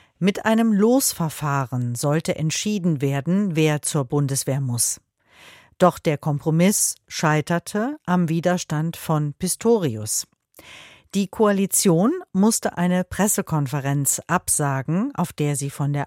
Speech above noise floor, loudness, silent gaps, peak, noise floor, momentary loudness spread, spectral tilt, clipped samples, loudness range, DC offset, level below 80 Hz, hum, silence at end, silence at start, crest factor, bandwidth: 29 dB; -21 LUFS; none; -2 dBFS; -50 dBFS; 7 LU; -5 dB/octave; under 0.1%; 2 LU; under 0.1%; -56 dBFS; none; 0 s; 0.2 s; 20 dB; 16.5 kHz